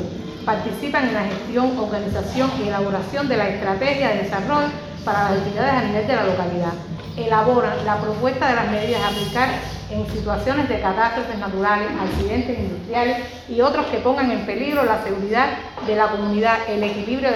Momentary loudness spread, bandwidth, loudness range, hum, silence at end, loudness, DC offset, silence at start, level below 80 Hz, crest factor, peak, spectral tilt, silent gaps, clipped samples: 6 LU; 16 kHz; 2 LU; none; 0 s; -21 LUFS; under 0.1%; 0 s; -42 dBFS; 18 dB; -2 dBFS; -6 dB/octave; none; under 0.1%